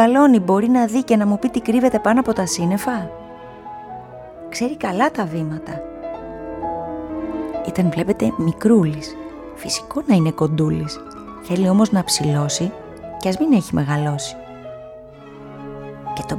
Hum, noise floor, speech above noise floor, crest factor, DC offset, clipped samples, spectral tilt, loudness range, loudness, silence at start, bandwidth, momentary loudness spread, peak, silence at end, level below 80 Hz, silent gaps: none; -38 dBFS; 21 dB; 18 dB; under 0.1%; under 0.1%; -5.5 dB/octave; 6 LU; -19 LUFS; 0 s; 16.5 kHz; 20 LU; -2 dBFS; 0 s; -48 dBFS; none